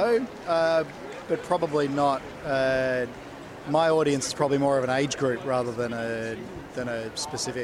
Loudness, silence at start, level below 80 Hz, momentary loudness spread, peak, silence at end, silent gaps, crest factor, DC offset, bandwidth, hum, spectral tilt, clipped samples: -26 LUFS; 0 s; -56 dBFS; 11 LU; -8 dBFS; 0 s; none; 18 dB; under 0.1%; 15.5 kHz; none; -4.5 dB/octave; under 0.1%